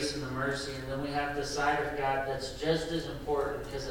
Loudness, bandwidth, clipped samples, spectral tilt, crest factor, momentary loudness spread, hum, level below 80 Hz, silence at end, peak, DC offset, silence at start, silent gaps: -33 LUFS; 18 kHz; under 0.1%; -4.5 dB/octave; 16 dB; 6 LU; none; -48 dBFS; 0 s; -16 dBFS; under 0.1%; 0 s; none